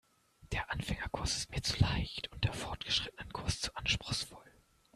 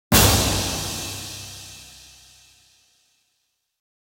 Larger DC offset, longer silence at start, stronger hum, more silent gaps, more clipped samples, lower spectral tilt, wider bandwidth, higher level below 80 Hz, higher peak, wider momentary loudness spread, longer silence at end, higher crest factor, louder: neither; first, 0.4 s vs 0.1 s; neither; neither; neither; about the same, -3.5 dB/octave vs -3 dB/octave; second, 14 kHz vs 17.5 kHz; second, -48 dBFS vs -36 dBFS; second, -14 dBFS vs -2 dBFS; second, 8 LU vs 26 LU; second, 0.45 s vs 2.15 s; about the same, 24 dB vs 24 dB; second, -36 LUFS vs -20 LUFS